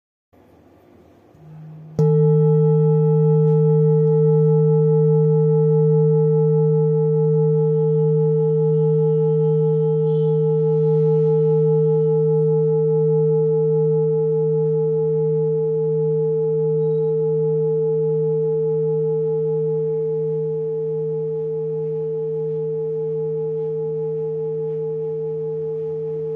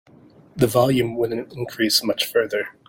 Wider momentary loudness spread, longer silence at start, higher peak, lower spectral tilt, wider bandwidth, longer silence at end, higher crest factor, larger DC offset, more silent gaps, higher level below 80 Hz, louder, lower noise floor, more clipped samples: about the same, 8 LU vs 10 LU; first, 1.45 s vs 0.55 s; second, -8 dBFS vs -4 dBFS; first, -13.5 dB/octave vs -4.5 dB/octave; second, 2 kHz vs 17 kHz; second, 0 s vs 0.15 s; second, 10 dB vs 18 dB; neither; neither; second, -70 dBFS vs -54 dBFS; about the same, -19 LUFS vs -21 LUFS; about the same, -50 dBFS vs -50 dBFS; neither